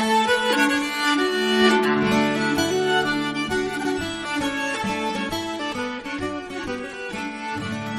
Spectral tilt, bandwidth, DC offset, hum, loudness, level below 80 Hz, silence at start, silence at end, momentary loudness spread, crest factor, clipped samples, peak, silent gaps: -4 dB/octave; 15 kHz; under 0.1%; none; -22 LUFS; -52 dBFS; 0 s; 0 s; 11 LU; 18 dB; under 0.1%; -4 dBFS; none